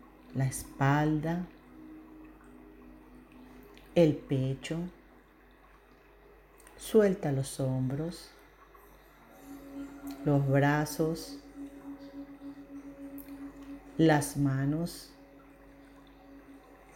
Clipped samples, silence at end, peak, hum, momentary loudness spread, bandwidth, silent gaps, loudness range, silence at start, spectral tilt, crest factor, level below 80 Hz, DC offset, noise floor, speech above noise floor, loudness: under 0.1%; 0.2 s; -12 dBFS; none; 26 LU; 17 kHz; none; 2 LU; 0.3 s; -6.5 dB/octave; 22 dB; -58 dBFS; under 0.1%; -59 dBFS; 30 dB; -30 LUFS